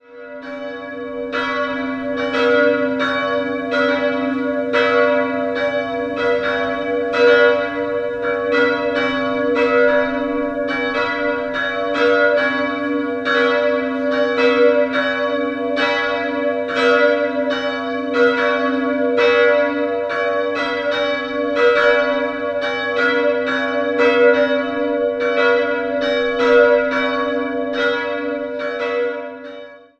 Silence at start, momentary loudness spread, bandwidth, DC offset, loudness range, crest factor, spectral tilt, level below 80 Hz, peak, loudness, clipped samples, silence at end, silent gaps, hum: 0.1 s; 8 LU; 7.6 kHz; under 0.1%; 2 LU; 16 dB; -5 dB/octave; -54 dBFS; -2 dBFS; -17 LUFS; under 0.1%; 0.2 s; none; none